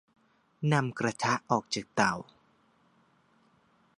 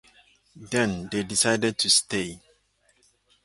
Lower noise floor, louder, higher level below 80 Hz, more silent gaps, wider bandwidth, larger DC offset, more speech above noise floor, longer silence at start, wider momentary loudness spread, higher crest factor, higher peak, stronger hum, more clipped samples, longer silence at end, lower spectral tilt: about the same, -67 dBFS vs -66 dBFS; second, -30 LUFS vs -23 LUFS; second, -70 dBFS vs -58 dBFS; neither; about the same, 11 kHz vs 12 kHz; neither; about the same, 38 dB vs 41 dB; about the same, 0.6 s vs 0.55 s; second, 5 LU vs 10 LU; about the same, 24 dB vs 22 dB; second, -10 dBFS vs -6 dBFS; neither; neither; first, 1.75 s vs 1.05 s; first, -5 dB/octave vs -2.5 dB/octave